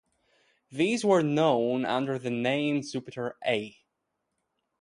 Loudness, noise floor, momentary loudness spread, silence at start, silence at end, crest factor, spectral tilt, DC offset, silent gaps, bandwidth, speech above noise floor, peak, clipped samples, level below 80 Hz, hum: -27 LUFS; -81 dBFS; 12 LU; 0.7 s; 1.1 s; 18 dB; -5.5 dB/octave; under 0.1%; none; 11.5 kHz; 54 dB; -10 dBFS; under 0.1%; -72 dBFS; none